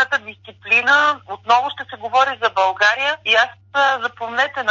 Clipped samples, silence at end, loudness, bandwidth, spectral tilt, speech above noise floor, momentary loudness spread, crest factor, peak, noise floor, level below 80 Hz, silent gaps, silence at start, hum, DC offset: under 0.1%; 0 s; -17 LUFS; 7.6 kHz; -1.5 dB/octave; 21 dB; 11 LU; 16 dB; -2 dBFS; -38 dBFS; -66 dBFS; none; 0 s; none; under 0.1%